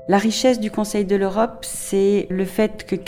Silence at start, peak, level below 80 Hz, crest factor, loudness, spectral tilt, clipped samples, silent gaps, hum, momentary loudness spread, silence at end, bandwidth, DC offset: 0 s; -4 dBFS; -46 dBFS; 16 dB; -20 LUFS; -5 dB/octave; under 0.1%; none; none; 5 LU; 0 s; 17 kHz; under 0.1%